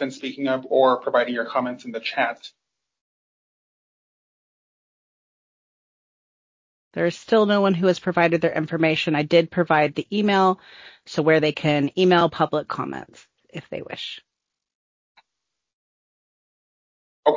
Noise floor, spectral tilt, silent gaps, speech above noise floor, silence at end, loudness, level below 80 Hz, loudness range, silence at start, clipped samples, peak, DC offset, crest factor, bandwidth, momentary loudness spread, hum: -82 dBFS; -6.5 dB/octave; 3.01-6.91 s, 14.75-15.15 s, 15.73-17.23 s; 61 dB; 0 s; -21 LUFS; -66 dBFS; 16 LU; 0 s; under 0.1%; -4 dBFS; under 0.1%; 20 dB; 7.6 kHz; 14 LU; none